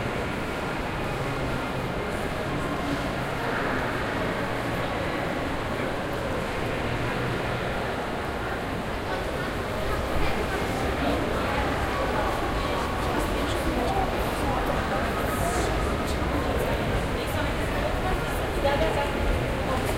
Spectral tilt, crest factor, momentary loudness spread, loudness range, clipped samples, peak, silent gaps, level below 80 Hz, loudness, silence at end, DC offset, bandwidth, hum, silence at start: -5.5 dB/octave; 16 dB; 4 LU; 2 LU; under 0.1%; -10 dBFS; none; -34 dBFS; -27 LUFS; 0 s; under 0.1%; 16 kHz; none; 0 s